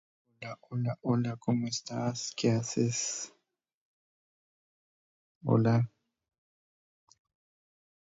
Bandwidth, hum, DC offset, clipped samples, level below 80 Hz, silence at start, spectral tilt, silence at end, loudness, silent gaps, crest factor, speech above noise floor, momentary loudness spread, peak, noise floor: 8 kHz; none; under 0.1%; under 0.1%; -70 dBFS; 0.4 s; -5.5 dB/octave; 2.15 s; -31 LUFS; 3.74-5.41 s; 20 dB; over 60 dB; 13 LU; -14 dBFS; under -90 dBFS